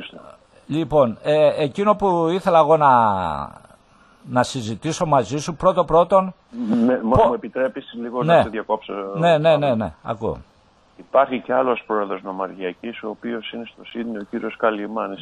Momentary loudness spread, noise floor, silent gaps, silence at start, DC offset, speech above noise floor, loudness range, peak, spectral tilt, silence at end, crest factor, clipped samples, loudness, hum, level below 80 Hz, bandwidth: 14 LU; -52 dBFS; none; 0 s; under 0.1%; 33 dB; 6 LU; -2 dBFS; -6 dB/octave; 0 s; 18 dB; under 0.1%; -20 LUFS; none; -46 dBFS; 11.5 kHz